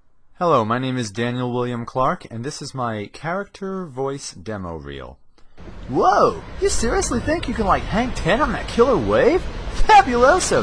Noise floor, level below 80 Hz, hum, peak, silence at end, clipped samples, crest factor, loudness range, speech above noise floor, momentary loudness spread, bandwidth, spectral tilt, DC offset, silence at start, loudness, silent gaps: -39 dBFS; -32 dBFS; none; -2 dBFS; 0 s; under 0.1%; 18 dB; 11 LU; 20 dB; 15 LU; 10.5 kHz; -4.5 dB/octave; under 0.1%; 0.1 s; -20 LUFS; none